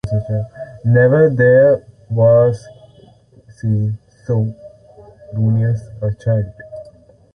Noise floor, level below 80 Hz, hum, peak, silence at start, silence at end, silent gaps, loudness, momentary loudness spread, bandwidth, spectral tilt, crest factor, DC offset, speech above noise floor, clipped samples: -46 dBFS; -44 dBFS; none; -2 dBFS; 0.05 s; 0.45 s; none; -16 LUFS; 18 LU; 6.4 kHz; -10 dB/octave; 14 dB; under 0.1%; 32 dB; under 0.1%